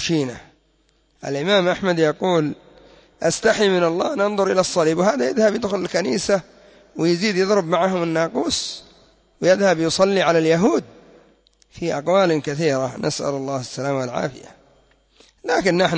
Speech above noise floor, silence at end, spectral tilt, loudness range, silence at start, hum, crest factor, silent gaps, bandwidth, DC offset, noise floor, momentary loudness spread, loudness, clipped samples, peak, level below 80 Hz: 42 dB; 0 s; -4.5 dB/octave; 4 LU; 0 s; none; 16 dB; none; 8 kHz; under 0.1%; -61 dBFS; 10 LU; -20 LUFS; under 0.1%; -6 dBFS; -54 dBFS